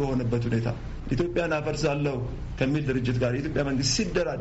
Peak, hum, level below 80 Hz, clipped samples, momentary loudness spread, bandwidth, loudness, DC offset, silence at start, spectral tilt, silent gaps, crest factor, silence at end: -10 dBFS; none; -40 dBFS; under 0.1%; 7 LU; 8 kHz; -27 LUFS; under 0.1%; 0 s; -5.5 dB/octave; none; 16 dB; 0 s